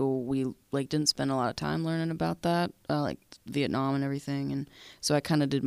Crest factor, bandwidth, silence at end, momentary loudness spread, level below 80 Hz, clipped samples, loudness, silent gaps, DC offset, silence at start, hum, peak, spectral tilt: 18 dB; 15.5 kHz; 0 s; 8 LU; -60 dBFS; under 0.1%; -30 LUFS; none; under 0.1%; 0 s; none; -12 dBFS; -5 dB/octave